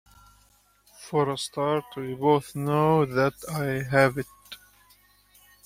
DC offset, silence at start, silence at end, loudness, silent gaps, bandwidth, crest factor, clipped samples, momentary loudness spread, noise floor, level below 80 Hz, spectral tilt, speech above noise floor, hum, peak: under 0.1%; 1 s; 1.1 s; -25 LUFS; none; 16 kHz; 22 dB; under 0.1%; 18 LU; -62 dBFS; -58 dBFS; -6 dB/octave; 37 dB; 50 Hz at -60 dBFS; -6 dBFS